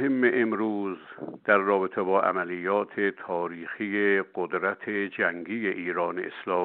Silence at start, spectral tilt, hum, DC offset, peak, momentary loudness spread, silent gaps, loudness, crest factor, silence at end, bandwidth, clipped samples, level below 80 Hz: 0 s; -4 dB/octave; none; under 0.1%; -8 dBFS; 10 LU; none; -27 LUFS; 20 dB; 0 s; 4.3 kHz; under 0.1%; -78 dBFS